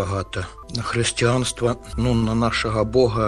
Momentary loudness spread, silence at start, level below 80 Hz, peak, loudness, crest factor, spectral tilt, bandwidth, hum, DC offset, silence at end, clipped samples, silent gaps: 10 LU; 0 s; -36 dBFS; -4 dBFS; -22 LUFS; 16 dB; -5 dB/octave; 12.5 kHz; none; under 0.1%; 0 s; under 0.1%; none